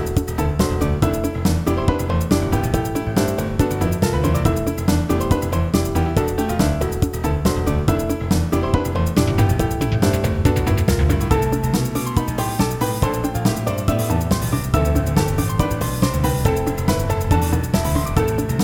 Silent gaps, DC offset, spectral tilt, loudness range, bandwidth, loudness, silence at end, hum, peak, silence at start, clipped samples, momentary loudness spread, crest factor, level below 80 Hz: none; under 0.1%; -6.5 dB/octave; 1 LU; 18 kHz; -20 LUFS; 0 s; none; 0 dBFS; 0 s; under 0.1%; 3 LU; 18 dB; -28 dBFS